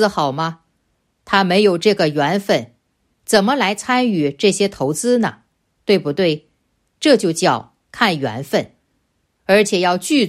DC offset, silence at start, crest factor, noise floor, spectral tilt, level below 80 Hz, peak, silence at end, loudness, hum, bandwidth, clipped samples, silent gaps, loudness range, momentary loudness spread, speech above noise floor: under 0.1%; 0 s; 16 dB; -67 dBFS; -4.5 dB/octave; -58 dBFS; 0 dBFS; 0 s; -17 LUFS; none; 15 kHz; under 0.1%; none; 2 LU; 9 LU; 51 dB